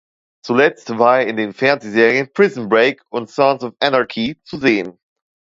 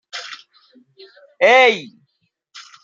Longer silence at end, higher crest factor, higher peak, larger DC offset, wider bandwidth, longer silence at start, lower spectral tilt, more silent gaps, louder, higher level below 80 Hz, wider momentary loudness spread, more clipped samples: first, 0.55 s vs 0.25 s; about the same, 16 dB vs 18 dB; about the same, 0 dBFS vs -2 dBFS; neither; about the same, 7.8 kHz vs 7.8 kHz; first, 0.45 s vs 0.15 s; first, -5.5 dB/octave vs -2 dB/octave; neither; second, -16 LUFS vs -13 LUFS; first, -60 dBFS vs -76 dBFS; second, 9 LU vs 24 LU; neither